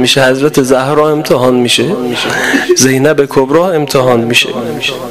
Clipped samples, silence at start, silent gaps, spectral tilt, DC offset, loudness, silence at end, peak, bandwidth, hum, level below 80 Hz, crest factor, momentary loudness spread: 0.5%; 0 s; none; -4 dB/octave; 0.8%; -9 LUFS; 0 s; 0 dBFS; 16 kHz; none; -44 dBFS; 10 dB; 6 LU